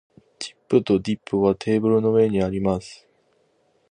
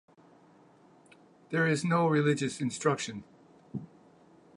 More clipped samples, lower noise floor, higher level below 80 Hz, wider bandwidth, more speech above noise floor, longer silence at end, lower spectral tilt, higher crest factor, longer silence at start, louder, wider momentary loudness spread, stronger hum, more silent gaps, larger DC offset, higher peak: neither; first, -64 dBFS vs -60 dBFS; first, -50 dBFS vs -74 dBFS; about the same, 10 kHz vs 11 kHz; first, 44 dB vs 31 dB; first, 0.95 s vs 0.7 s; first, -7 dB/octave vs -5.5 dB/octave; about the same, 18 dB vs 20 dB; second, 0.4 s vs 1.5 s; first, -21 LUFS vs -29 LUFS; about the same, 16 LU vs 17 LU; neither; neither; neither; first, -4 dBFS vs -12 dBFS